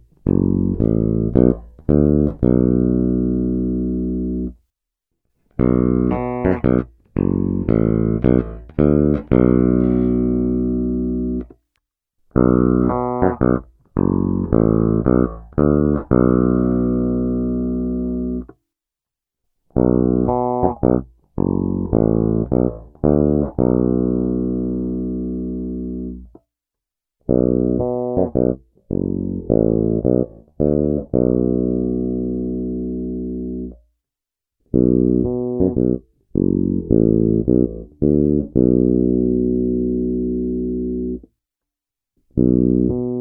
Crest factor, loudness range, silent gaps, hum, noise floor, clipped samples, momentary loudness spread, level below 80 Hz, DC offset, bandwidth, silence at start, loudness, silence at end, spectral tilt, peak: 18 dB; 5 LU; none; none; -87 dBFS; under 0.1%; 9 LU; -32 dBFS; under 0.1%; 2.9 kHz; 0.25 s; -19 LUFS; 0 s; -14 dB/octave; 0 dBFS